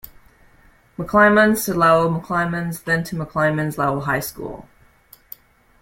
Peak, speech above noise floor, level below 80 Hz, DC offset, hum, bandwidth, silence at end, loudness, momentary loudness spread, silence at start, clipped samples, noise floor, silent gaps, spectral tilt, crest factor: -2 dBFS; 34 dB; -48 dBFS; under 0.1%; none; 16.5 kHz; 1.2 s; -18 LUFS; 20 LU; 0.05 s; under 0.1%; -53 dBFS; none; -5.5 dB/octave; 18 dB